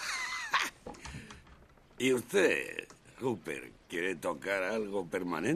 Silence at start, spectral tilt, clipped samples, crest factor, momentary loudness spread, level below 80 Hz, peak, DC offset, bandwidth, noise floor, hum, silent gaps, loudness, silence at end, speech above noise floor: 0 s; -3.5 dB/octave; under 0.1%; 22 dB; 18 LU; -62 dBFS; -14 dBFS; under 0.1%; 13.5 kHz; -59 dBFS; none; none; -33 LUFS; 0 s; 26 dB